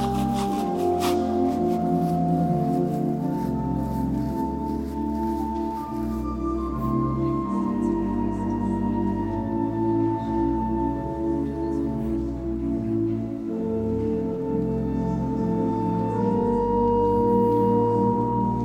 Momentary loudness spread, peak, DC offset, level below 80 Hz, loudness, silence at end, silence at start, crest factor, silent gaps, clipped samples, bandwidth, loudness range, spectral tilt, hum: 7 LU; -10 dBFS; under 0.1%; -38 dBFS; -25 LUFS; 0 s; 0 s; 14 dB; none; under 0.1%; 16.5 kHz; 4 LU; -8.5 dB/octave; none